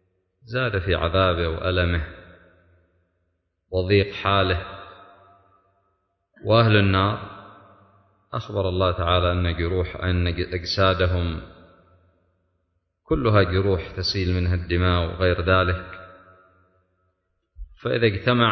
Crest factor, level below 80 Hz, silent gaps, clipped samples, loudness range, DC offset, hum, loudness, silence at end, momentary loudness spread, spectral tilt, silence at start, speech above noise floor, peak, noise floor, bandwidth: 18 dB; -34 dBFS; none; under 0.1%; 4 LU; under 0.1%; none; -22 LUFS; 0 s; 13 LU; -7 dB/octave; 0.45 s; 52 dB; -4 dBFS; -73 dBFS; 6.4 kHz